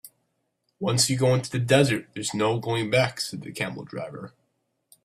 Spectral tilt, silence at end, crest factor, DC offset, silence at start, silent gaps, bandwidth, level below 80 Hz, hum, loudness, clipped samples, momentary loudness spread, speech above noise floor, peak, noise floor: -4.5 dB/octave; 0.75 s; 20 dB; under 0.1%; 0.05 s; none; 14.5 kHz; -60 dBFS; none; -24 LUFS; under 0.1%; 15 LU; 50 dB; -6 dBFS; -75 dBFS